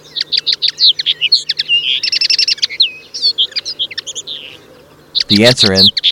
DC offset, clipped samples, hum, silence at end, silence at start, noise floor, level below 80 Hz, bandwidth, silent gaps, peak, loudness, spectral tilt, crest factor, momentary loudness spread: under 0.1%; under 0.1%; none; 0 s; 0.15 s; -42 dBFS; -54 dBFS; 17 kHz; none; 0 dBFS; -11 LUFS; -2.5 dB/octave; 14 dB; 12 LU